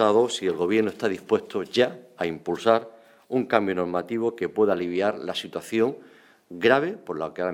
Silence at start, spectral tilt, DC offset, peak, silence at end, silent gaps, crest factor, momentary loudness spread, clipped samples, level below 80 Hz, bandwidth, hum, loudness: 0 s; -5 dB/octave; under 0.1%; -4 dBFS; 0 s; none; 22 dB; 9 LU; under 0.1%; -68 dBFS; 15.5 kHz; none; -25 LUFS